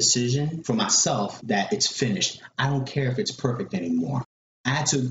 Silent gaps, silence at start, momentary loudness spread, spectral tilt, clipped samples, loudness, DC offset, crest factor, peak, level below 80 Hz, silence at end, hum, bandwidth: 4.25-4.64 s; 0 s; 9 LU; -3.5 dB/octave; under 0.1%; -24 LUFS; under 0.1%; 18 dB; -8 dBFS; -56 dBFS; 0 s; none; 8 kHz